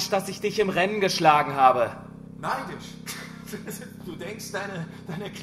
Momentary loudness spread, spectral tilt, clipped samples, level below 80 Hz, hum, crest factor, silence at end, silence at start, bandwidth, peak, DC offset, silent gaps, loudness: 18 LU; -4 dB/octave; under 0.1%; -60 dBFS; none; 22 dB; 0 s; 0 s; 15.5 kHz; -4 dBFS; under 0.1%; none; -24 LUFS